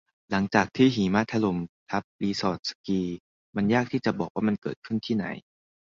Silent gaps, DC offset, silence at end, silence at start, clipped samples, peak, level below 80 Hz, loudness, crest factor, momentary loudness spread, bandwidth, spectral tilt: 1.69-1.86 s, 2.04-2.19 s, 2.59-2.63 s, 2.75-2.84 s, 3.20-3.53 s, 4.30-4.35 s, 4.58-4.62 s, 4.76-4.82 s; under 0.1%; 0.55 s; 0.3 s; under 0.1%; -6 dBFS; -58 dBFS; -27 LUFS; 22 dB; 11 LU; 7.6 kHz; -6 dB/octave